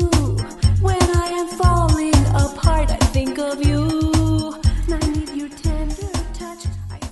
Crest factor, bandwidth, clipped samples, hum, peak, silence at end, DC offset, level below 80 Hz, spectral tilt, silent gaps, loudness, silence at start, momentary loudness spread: 16 dB; 12 kHz; under 0.1%; none; -2 dBFS; 0 s; under 0.1%; -22 dBFS; -6 dB/octave; none; -19 LUFS; 0 s; 11 LU